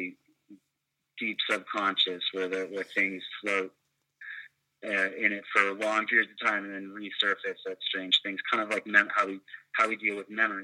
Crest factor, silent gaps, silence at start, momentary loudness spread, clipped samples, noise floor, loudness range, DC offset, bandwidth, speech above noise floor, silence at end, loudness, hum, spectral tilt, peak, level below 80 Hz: 24 dB; none; 0 s; 15 LU; under 0.1%; -82 dBFS; 4 LU; under 0.1%; 13.5 kHz; 52 dB; 0 s; -28 LUFS; none; -2.5 dB/octave; -6 dBFS; -84 dBFS